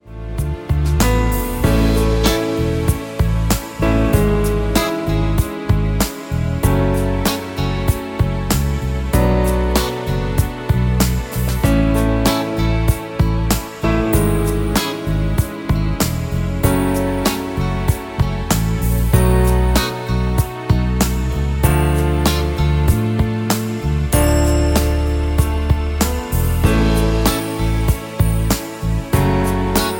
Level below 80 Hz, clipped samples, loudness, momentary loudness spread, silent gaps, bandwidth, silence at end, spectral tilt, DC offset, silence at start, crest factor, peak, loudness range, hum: -20 dBFS; under 0.1%; -18 LUFS; 5 LU; none; 17 kHz; 0 s; -6 dB/octave; under 0.1%; 0.05 s; 16 dB; 0 dBFS; 2 LU; none